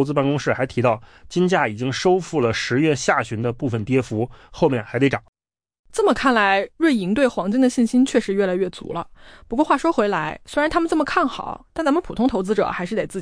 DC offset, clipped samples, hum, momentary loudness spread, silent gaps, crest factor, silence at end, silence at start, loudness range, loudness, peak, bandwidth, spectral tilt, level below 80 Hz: under 0.1%; under 0.1%; none; 8 LU; 5.28-5.33 s, 5.79-5.84 s; 14 dB; 0 s; 0 s; 3 LU; -20 LUFS; -6 dBFS; 10.5 kHz; -5.5 dB/octave; -48 dBFS